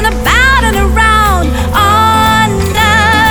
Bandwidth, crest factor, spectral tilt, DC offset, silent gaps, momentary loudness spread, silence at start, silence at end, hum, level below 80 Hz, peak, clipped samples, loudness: over 20 kHz; 8 dB; -4 dB/octave; under 0.1%; none; 4 LU; 0 s; 0 s; none; -16 dBFS; 0 dBFS; under 0.1%; -8 LUFS